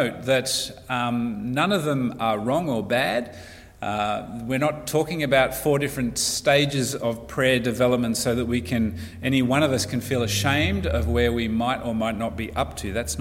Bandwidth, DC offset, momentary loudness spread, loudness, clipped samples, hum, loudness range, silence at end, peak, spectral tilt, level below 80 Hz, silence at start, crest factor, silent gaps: 16.5 kHz; under 0.1%; 8 LU; -23 LUFS; under 0.1%; none; 3 LU; 0 s; -6 dBFS; -4.5 dB/octave; -40 dBFS; 0 s; 18 dB; none